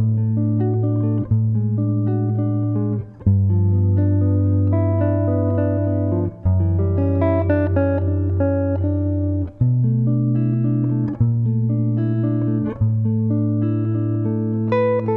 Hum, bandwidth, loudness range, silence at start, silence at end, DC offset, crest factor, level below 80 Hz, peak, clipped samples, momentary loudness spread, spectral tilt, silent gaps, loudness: none; 3.7 kHz; 1 LU; 0 s; 0 s; under 0.1%; 12 dB; -42 dBFS; -6 dBFS; under 0.1%; 3 LU; -13 dB/octave; none; -19 LUFS